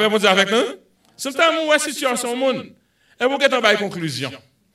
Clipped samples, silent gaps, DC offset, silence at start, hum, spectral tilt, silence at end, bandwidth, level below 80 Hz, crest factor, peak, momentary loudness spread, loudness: under 0.1%; none; under 0.1%; 0 s; none; -3 dB/octave; 0.35 s; 16 kHz; -70 dBFS; 20 dB; 0 dBFS; 12 LU; -18 LUFS